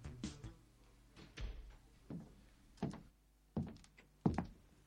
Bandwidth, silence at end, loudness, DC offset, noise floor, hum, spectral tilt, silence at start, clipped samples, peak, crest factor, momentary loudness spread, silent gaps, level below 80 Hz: 15.5 kHz; 0.05 s; -47 LUFS; under 0.1%; -69 dBFS; none; -7 dB/octave; 0 s; under 0.1%; -20 dBFS; 28 dB; 26 LU; none; -58 dBFS